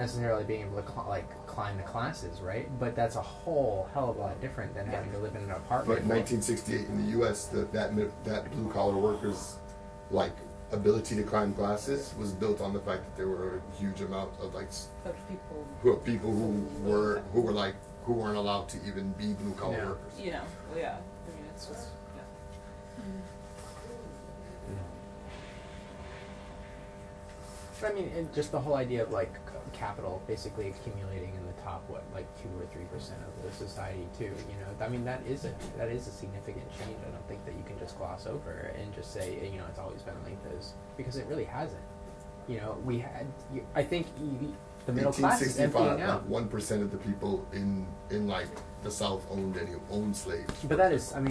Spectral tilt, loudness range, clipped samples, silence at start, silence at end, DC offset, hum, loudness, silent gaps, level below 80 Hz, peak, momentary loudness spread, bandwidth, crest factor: -6 dB/octave; 11 LU; under 0.1%; 0 s; 0 s; under 0.1%; none; -34 LUFS; none; -50 dBFS; -12 dBFS; 16 LU; 11 kHz; 22 dB